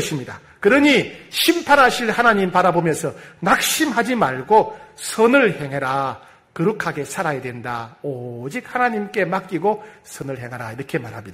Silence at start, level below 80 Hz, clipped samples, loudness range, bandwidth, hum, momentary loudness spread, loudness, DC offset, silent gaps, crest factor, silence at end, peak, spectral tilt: 0 s; -54 dBFS; under 0.1%; 8 LU; 16 kHz; none; 15 LU; -19 LUFS; under 0.1%; none; 18 dB; 0 s; -2 dBFS; -4 dB/octave